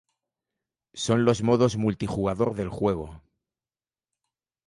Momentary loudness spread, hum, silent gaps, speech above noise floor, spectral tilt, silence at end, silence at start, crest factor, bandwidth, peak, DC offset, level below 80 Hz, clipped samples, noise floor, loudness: 11 LU; none; none; over 66 dB; -6.5 dB/octave; 1.5 s; 0.95 s; 20 dB; 11.5 kHz; -6 dBFS; under 0.1%; -52 dBFS; under 0.1%; under -90 dBFS; -25 LUFS